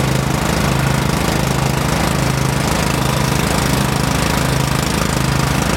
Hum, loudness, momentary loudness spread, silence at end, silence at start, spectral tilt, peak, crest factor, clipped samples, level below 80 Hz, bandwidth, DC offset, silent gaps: none; -16 LUFS; 1 LU; 0 s; 0 s; -4.5 dB/octave; 0 dBFS; 16 dB; under 0.1%; -26 dBFS; 17 kHz; under 0.1%; none